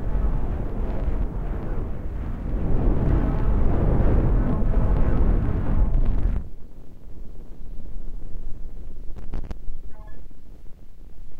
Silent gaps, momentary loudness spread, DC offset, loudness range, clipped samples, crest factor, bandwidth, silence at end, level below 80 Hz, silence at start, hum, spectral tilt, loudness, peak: none; 21 LU; under 0.1%; 17 LU; under 0.1%; 16 dB; 3.3 kHz; 0 s; -24 dBFS; 0 s; none; -10.5 dB/octave; -26 LUFS; -6 dBFS